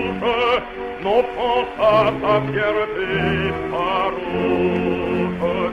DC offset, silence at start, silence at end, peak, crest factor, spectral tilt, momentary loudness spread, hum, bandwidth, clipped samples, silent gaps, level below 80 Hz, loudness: under 0.1%; 0 s; 0 s; -4 dBFS; 16 dB; -7 dB/octave; 5 LU; none; 12 kHz; under 0.1%; none; -42 dBFS; -20 LUFS